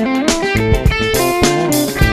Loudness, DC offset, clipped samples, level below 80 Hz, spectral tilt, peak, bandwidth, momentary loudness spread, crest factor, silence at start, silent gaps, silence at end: -14 LUFS; under 0.1%; under 0.1%; -22 dBFS; -4.5 dB/octave; 0 dBFS; 14.5 kHz; 2 LU; 12 dB; 0 s; none; 0 s